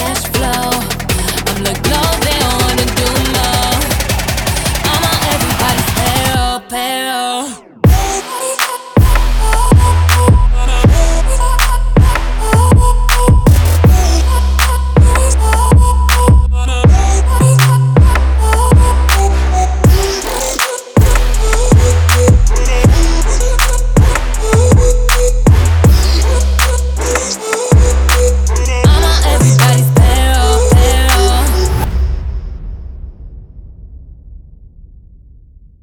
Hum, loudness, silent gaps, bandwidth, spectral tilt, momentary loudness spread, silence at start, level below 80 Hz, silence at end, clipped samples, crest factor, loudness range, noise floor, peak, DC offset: none; -11 LUFS; none; over 20 kHz; -4.5 dB/octave; 7 LU; 0 s; -12 dBFS; 1.45 s; 0.1%; 10 dB; 4 LU; -39 dBFS; 0 dBFS; under 0.1%